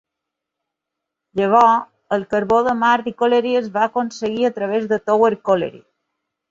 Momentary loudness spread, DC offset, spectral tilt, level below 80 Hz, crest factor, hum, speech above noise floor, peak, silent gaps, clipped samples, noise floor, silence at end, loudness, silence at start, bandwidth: 9 LU; under 0.1%; -5.5 dB/octave; -58 dBFS; 18 dB; none; 65 dB; -2 dBFS; none; under 0.1%; -82 dBFS; 0.75 s; -18 LUFS; 1.35 s; 7.6 kHz